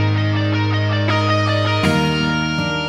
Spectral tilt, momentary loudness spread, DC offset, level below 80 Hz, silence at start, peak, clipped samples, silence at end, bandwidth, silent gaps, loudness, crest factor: -6 dB/octave; 2 LU; under 0.1%; -42 dBFS; 0 s; -4 dBFS; under 0.1%; 0 s; 11 kHz; none; -17 LUFS; 12 dB